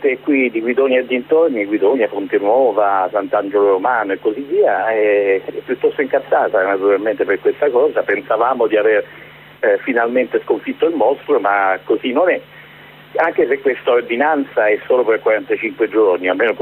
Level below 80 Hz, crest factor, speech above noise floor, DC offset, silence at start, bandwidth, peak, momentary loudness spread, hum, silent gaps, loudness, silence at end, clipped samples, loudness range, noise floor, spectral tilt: -62 dBFS; 12 dB; 25 dB; under 0.1%; 0 s; 4.1 kHz; -4 dBFS; 4 LU; none; none; -16 LUFS; 0 s; under 0.1%; 2 LU; -40 dBFS; -7.5 dB/octave